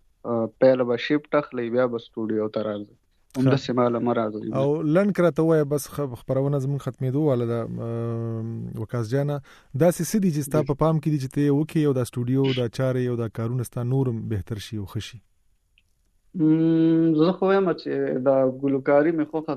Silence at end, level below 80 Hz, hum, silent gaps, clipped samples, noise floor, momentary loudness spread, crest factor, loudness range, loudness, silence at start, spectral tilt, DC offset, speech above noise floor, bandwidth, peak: 0 s; -56 dBFS; none; none; under 0.1%; -64 dBFS; 11 LU; 18 dB; 5 LU; -24 LUFS; 0.25 s; -7.5 dB/octave; under 0.1%; 42 dB; 14 kHz; -6 dBFS